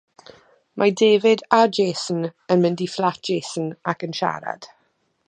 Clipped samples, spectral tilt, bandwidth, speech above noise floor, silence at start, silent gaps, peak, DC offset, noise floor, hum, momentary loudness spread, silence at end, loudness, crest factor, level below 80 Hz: under 0.1%; -5 dB/octave; 9.8 kHz; 47 dB; 0.75 s; none; 0 dBFS; under 0.1%; -67 dBFS; none; 12 LU; 0.6 s; -21 LUFS; 20 dB; -72 dBFS